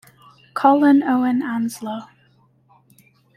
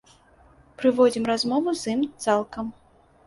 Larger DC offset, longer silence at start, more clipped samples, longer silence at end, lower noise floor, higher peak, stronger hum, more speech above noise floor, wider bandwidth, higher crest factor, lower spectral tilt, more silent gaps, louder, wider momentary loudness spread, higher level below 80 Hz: neither; second, 0.55 s vs 0.8 s; neither; first, 1.3 s vs 0.55 s; about the same, -57 dBFS vs -55 dBFS; first, -2 dBFS vs -6 dBFS; neither; first, 40 dB vs 32 dB; first, 13.5 kHz vs 11.5 kHz; about the same, 18 dB vs 18 dB; about the same, -5.5 dB/octave vs -4.5 dB/octave; neither; first, -18 LUFS vs -24 LUFS; first, 17 LU vs 13 LU; second, -68 dBFS vs -60 dBFS